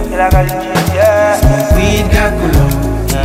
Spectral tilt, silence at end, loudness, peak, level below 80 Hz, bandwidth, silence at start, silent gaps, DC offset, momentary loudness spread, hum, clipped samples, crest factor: -5.5 dB/octave; 0 s; -11 LUFS; 0 dBFS; -16 dBFS; 16.5 kHz; 0 s; none; under 0.1%; 5 LU; none; under 0.1%; 10 dB